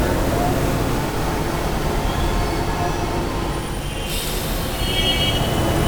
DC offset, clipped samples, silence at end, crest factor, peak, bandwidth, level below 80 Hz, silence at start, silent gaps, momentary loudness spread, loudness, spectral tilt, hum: under 0.1%; under 0.1%; 0 s; 14 dB; -6 dBFS; over 20 kHz; -26 dBFS; 0 s; none; 6 LU; -21 LUFS; -4.5 dB/octave; none